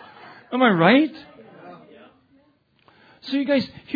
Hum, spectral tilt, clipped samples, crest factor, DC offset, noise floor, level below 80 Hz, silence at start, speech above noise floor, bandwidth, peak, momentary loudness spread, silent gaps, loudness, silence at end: none; -8 dB/octave; under 0.1%; 22 dB; under 0.1%; -61 dBFS; -70 dBFS; 0.5 s; 42 dB; 5 kHz; -2 dBFS; 18 LU; none; -20 LUFS; 0 s